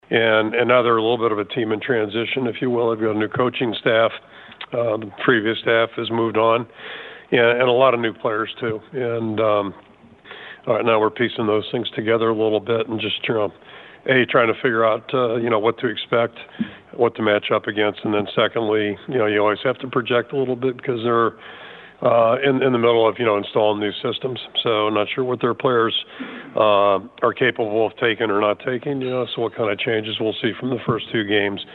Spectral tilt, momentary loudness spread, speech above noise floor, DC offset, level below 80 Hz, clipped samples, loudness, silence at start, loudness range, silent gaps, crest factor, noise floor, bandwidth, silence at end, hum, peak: -8.5 dB/octave; 8 LU; 23 dB; under 0.1%; -66 dBFS; under 0.1%; -20 LUFS; 0.1 s; 3 LU; none; 18 dB; -43 dBFS; 4.4 kHz; 0 s; none; -2 dBFS